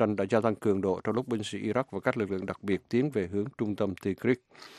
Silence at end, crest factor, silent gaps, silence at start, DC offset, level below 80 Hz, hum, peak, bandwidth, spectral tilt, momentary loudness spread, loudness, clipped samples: 0 s; 20 dB; none; 0 s; under 0.1%; -68 dBFS; none; -10 dBFS; 13.5 kHz; -7 dB/octave; 6 LU; -30 LUFS; under 0.1%